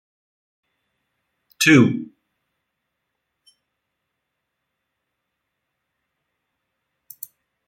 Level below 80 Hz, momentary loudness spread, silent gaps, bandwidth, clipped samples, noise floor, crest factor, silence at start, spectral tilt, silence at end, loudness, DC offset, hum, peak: -68 dBFS; 25 LU; none; 16.5 kHz; under 0.1%; -79 dBFS; 24 dB; 1.6 s; -4.5 dB/octave; 5.65 s; -15 LUFS; under 0.1%; none; -2 dBFS